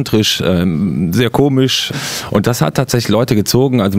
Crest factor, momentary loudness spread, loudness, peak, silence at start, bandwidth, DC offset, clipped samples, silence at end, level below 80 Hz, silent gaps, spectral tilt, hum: 12 dB; 3 LU; -14 LUFS; 0 dBFS; 0 s; 16.5 kHz; under 0.1%; under 0.1%; 0 s; -40 dBFS; none; -5 dB/octave; none